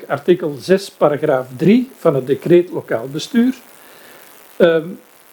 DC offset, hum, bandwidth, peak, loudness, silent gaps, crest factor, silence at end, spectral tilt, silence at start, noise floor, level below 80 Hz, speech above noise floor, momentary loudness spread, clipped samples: under 0.1%; none; 19 kHz; 0 dBFS; -16 LUFS; none; 16 dB; 0.35 s; -6.5 dB/octave; 0 s; -42 dBFS; -64 dBFS; 27 dB; 8 LU; under 0.1%